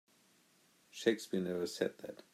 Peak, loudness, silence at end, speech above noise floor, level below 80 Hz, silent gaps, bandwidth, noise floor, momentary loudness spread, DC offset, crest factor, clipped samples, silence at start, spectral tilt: -16 dBFS; -37 LUFS; 0.2 s; 33 dB; -86 dBFS; none; 15.5 kHz; -70 dBFS; 13 LU; under 0.1%; 24 dB; under 0.1%; 0.95 s; -5 dB/octave